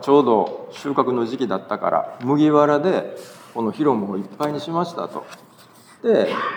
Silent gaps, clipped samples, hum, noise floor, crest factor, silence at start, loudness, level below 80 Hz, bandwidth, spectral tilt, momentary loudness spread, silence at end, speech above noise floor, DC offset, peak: none; under 0.1%; none; -48 dBFS; 18 dB; 0 s; -21 LUFS; -78 dBFS; 19 kHz; -7 dB/octave; 15 LU; 0 s; 28 dB; under 0.1%; -2 dBFS